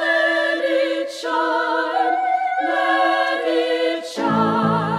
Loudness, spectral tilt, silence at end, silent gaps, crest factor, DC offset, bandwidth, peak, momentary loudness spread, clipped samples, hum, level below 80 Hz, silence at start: -19 LUFS; -5 dB/octave; 0 s; none; 12 dB; under 0.1%; 13 kHz; -6 dBFS; 5 LU; under 0.1%; none; -68 dBFS; 0 s